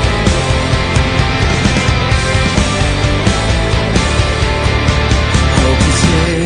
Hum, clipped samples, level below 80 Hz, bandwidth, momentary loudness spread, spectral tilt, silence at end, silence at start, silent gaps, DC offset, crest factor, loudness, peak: none; under 0.1%; -18 dBFS; 10.5 kHz; 2 LU; -5 dB/octave; 0 s; 0 s; none; under 0.1%; 12 dB; -12 LUFS; 0 dBFS